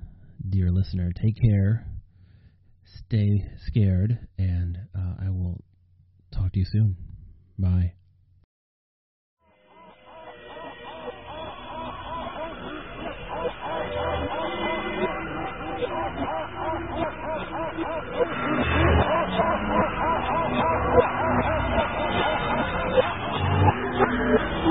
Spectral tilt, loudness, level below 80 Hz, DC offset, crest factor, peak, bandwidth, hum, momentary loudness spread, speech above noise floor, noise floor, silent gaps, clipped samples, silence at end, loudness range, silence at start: -5.5 dB/octave; -26 LUFS; -40 dBFS; under 0.1%; 20 dB; -6 dBFS; 5.6 kHz; none; 16 LU; 34 dB; -58 dBFS; 8.44-9.37 s; under 0.1%; 0 s; 13 LU; 0 s